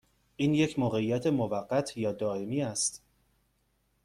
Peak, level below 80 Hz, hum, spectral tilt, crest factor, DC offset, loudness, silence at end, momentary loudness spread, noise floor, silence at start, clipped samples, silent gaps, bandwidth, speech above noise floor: -14 dBFS; -64 dBFS; none; -5 dB/octave; 16 dB; under 0.1%; -30 LUFS; 1.05 s; 5 LU; -73 dBFS; 0.4 s; under 0.1%; none; 14 kHz; 44 dB